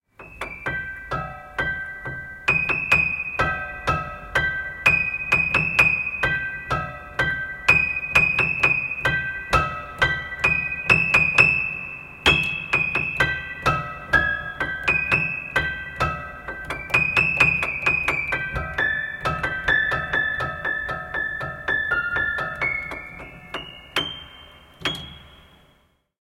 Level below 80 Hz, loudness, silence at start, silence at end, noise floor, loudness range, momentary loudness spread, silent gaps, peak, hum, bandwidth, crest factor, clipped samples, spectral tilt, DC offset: -42 dBFS; -21 LUFS; 0.2 s; 0.85 s; -62 dBFS; 7 LU; 14 LU; none; -2 dBFS; none; 16.5 kHz; 22 dB; under 0.1%; -4 dB/octave; under 0.1%